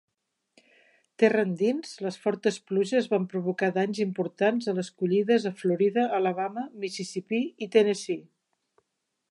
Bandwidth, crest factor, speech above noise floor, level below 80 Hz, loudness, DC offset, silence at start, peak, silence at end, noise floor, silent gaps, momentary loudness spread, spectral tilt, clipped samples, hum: 11.5 kHz; 20 dB; 55 dB; -82 dBFS; -27 LUFS; under 0.1%; 1.2 s; -8 dBFS; 1.1 s; -81 dBFS; none; 9 LU; -6 dB/octave; under 0.1%; none